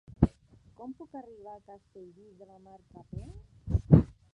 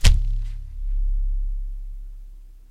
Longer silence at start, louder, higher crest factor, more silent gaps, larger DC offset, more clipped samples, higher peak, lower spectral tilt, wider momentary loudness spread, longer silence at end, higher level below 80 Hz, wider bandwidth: first, 0.2 s vs 0 s; first, -26 LUFS vs -29 LUFS; about the same, 26 dB vs 22 dB; neither; neither; neither; second, -6 dBFS vs 0 dBFS; first, -11.5 dB/octave vs -3.5 dB/octave; first, 27 LU vs 19 LU; first, 0.3 s vs 0.15 s; second, -42 dBFS vs -22 dBFS; second, 4.4 kHz vs 12 kHz